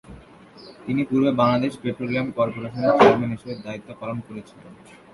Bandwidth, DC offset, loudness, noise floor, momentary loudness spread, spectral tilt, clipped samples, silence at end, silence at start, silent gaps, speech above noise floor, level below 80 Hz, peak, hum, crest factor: 11.5 kHz; under 0.1%; -21 LUFS; -46 dBFS; 18 LU; -7.5 dB/octave; under 0.1%; 0.4 s; 0.1 s; none; 24 dB; -56 dBFS; 0 dBFS; none; 22 dB